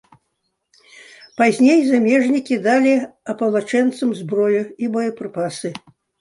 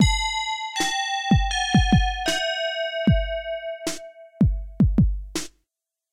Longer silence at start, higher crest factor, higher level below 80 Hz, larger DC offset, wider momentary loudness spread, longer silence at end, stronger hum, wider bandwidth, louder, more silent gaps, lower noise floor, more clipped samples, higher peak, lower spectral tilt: first, 1.4 s vs 0 s; about the same, 16 dB vs 16 dB; second, -68 dBFS vs -30 dBFS; neither; about the same, 12 LU vs 11 LU; second, 0.45 s vs 0.65 s; neither; second, 11.5 kHz vs 15.5 kHz; first, -18 LUFS vs -23 LUFS; neither; second, -72 dBFS vs -83 dBFS; neither; first, -2 dBFS vs -6 dBFS; about the same, -5.5 dB/octave vs -4.5 dB/octave